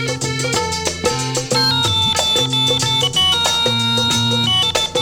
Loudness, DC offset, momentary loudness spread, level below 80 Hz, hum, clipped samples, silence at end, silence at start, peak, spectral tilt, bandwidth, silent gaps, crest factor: -15 LUFS; under 0.1%; 6 LU; -44 dBFS; none; under 0.1%; 0 s; 0 s; -2 dBFS; -2.5 dB/octave; 19 kHz; none; 16 dB